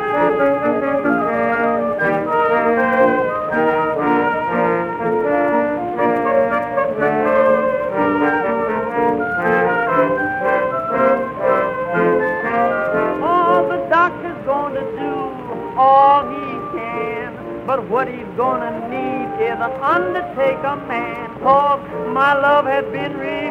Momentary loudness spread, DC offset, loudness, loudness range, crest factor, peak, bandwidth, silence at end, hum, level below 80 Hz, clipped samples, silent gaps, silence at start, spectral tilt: 9 LU; under 0.1%; -17 LUFS; 3 LU; 16 dB; 0 dBFS; 6.4 kHz; 0 s; none; -50 dBFS; under 0.1%; none; 0 s; -7.5 dB/octave